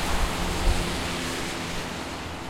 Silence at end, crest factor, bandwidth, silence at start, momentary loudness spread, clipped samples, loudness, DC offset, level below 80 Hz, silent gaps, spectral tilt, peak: 0 s; 18 dB; 16.5 kHz; 0 s; 6 LU; under 0.1%; -29 LUFS; under 0.1%; -32 dBFS; none; -3.5 dB/octave; -10 dBFS